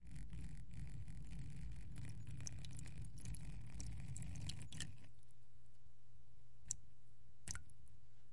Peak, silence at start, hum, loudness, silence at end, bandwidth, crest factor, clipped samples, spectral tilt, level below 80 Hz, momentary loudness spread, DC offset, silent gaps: -20 dBFS; 0 s; none; -53 LUFS; 0 s; 11.5 kHz; 32 dB; under 0.1%; -3.5 dB/octave; -58 dBFS; 8 LU; 0.6%; none